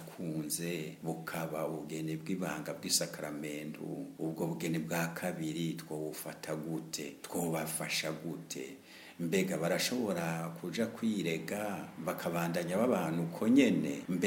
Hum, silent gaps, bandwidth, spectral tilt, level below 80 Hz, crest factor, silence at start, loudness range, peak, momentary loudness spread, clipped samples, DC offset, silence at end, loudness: none; none; 17 kHz; -4.5 dB/octave; -74 dBFS; 22 dB; 0 s; 5 LU; -14 dBFS; 10 LU; under 0.1%; under 0.1%; 0 s; -35 LUFS